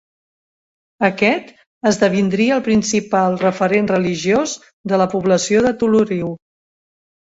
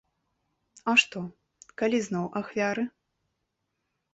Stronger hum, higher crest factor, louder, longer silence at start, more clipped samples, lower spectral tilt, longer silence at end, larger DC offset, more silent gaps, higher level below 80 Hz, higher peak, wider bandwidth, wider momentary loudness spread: neither; second, 16 dB vs 24 dB; first, -17 LUFS vs -27 LUFS; first, 1 s vs 0.85 s; neither; about the same, -5 dB/octave vs -4 dB/octave; second, 1 s vs 1.25 s; neither; first, 1.67-1.81 s, 4.73-4.84 s vs none; first, -52 dBFS vs -72 dBFS; first, -2 dBFS vs -8 dBFS; about the same, 8 kHz vs 8 kHz; second, 7 LU vs 16 LU